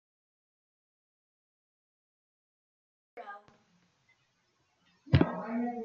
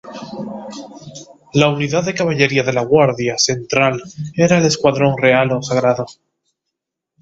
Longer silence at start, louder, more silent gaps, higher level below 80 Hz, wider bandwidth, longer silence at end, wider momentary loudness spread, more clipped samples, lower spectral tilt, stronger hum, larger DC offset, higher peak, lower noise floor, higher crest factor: first, 3.15 s vs 0.05 s; second, -30 LUFS vs -15 LUFS; neither; second, -58 dBFS vs -52 dBFS; second, 6.2 kHz vs 8 kHz; second, 0 s vs 1.1 s; first, 23 LU vs 17 LU; neither; first, -7 dB/octave vs -4.5 dB/octave; neither; neither; second, -10 dBFS vs 0 dBFS; second, -75 dBFS vs -79 dBFS; first, 28 dB vs 16 dB